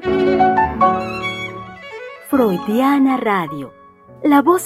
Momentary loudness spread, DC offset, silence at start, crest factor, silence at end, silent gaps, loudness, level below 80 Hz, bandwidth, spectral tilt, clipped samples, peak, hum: 18 LU; under 0.1%; 0 s; 16 dB; 0 s; none; -16 LUFS; -44 dBFS; 15 kHz; -6 dB/octave; under 0.1%; -2 dBFS; none